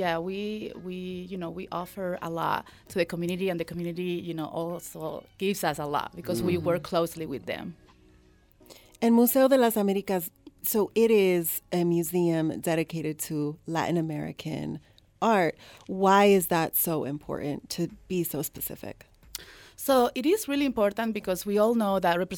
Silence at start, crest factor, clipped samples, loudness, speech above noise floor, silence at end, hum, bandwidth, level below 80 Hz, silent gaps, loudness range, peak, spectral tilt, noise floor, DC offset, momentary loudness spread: 0 s; 18 dB; under 0.1%; -27 LUFS; 32 dB; 0 s; none; 19 kHz; -60 dBFS; none; 7 LU; -10 dBFS; -5 dB/octave; -59 dBFS; under 0.1%; 15 LU